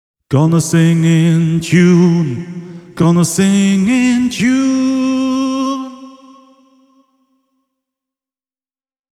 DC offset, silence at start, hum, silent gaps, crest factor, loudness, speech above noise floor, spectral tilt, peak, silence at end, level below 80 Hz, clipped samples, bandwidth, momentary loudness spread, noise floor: under 0.1%; 0.3 s; none; none; 14 dB; -13 LUFS; over 79 dB; -6 dB/octave; 0 dBFS; 3.05 s; -52 dBFS; under 0.1%; 13.5 kHz; 10 LU; under -90 dBFS